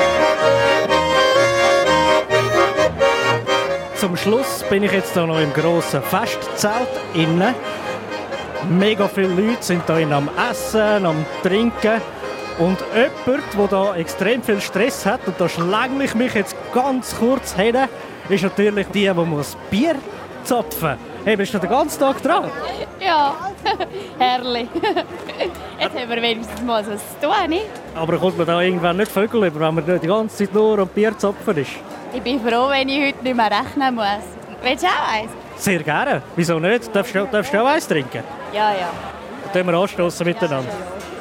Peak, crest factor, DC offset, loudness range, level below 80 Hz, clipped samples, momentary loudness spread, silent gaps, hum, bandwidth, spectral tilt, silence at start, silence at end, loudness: -2 dBFS; 16 dB; under 0.1%; 4 LU; -50 dBFS; under 0.1%; 10 LU; none; none; 16.5 kHz; -5 dB/octave; 0 s; 0 s; -19 LUFS